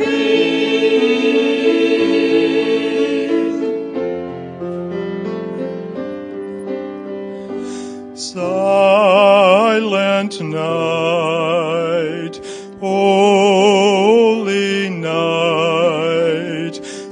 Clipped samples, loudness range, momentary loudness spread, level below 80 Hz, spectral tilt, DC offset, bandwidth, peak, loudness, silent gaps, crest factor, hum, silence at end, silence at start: under 0.1%; 11 LU; 16 LU; -64 dBFS; -5 dB/octave; under 0.1%; 10.5 kHz; 0 dBFS; -15 LUFS; none; 16 dB; none; 0 s; 0 s